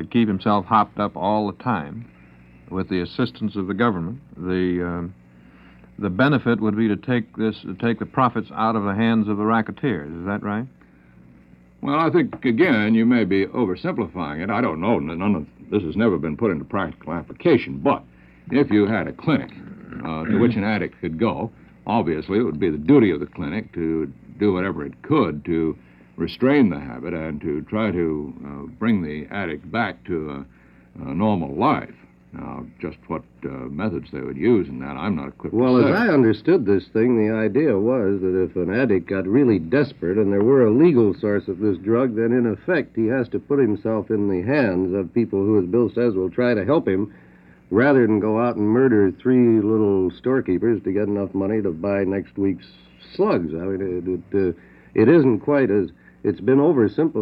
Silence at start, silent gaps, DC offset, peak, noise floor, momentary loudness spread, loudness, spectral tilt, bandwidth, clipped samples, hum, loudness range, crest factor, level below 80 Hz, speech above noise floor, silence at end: 0 s; none; under 0.1%; -2 dBFS; -50 dBFS; 13 LU; -21 LUFS; -10 dB/octave; 5.6 kHz; under 0.1%; none; 7 LU; 18 dB; -52 dBFS; 30 dB; 0 s